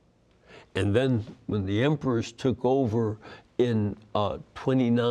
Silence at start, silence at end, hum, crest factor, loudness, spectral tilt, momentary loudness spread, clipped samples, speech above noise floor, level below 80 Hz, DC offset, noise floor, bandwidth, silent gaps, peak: 0.5 s; 0 s; none; 16 dB; -27 LUFS; -7.5 dB/octave; 8 LU; under 0.1%; 35 dB; -60 dBFS; under 0.1%; -61 dBFS; 10 kHz; none; -10 dBFS